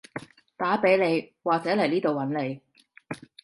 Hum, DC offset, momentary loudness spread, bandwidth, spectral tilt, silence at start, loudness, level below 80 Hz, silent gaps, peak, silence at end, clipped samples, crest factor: none; under 0.1%; 19 LU; 11.5 kHz; -6.5 dB/octave; 0.15 s; -25 LUFS; -70 dBFS; none; -8 dBFS; 0.25 s; under 0.1%; 18 dB